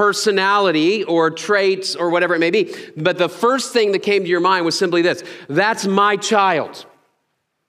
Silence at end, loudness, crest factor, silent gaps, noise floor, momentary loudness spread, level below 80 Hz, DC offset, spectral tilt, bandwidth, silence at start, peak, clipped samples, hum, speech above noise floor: 0.85 s; -17 LUFS; 16 dB; none; -71 dBFS; 5 LU; -72 dBFS; under 0.1%; -4 dB/octave; 15 kHz; 0 s; 0 dBFS; under 0.1%; none; 54 dB